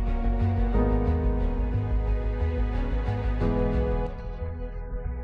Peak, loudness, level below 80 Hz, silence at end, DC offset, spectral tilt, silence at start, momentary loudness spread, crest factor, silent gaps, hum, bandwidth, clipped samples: -12 dBFS; -28 LUFS; -28 dBFS; 0 s; under 0.1%; -10 dB/octave; 0 s; 10 LU; 14 dB; none; none; 4.7 kHz; under 0.1%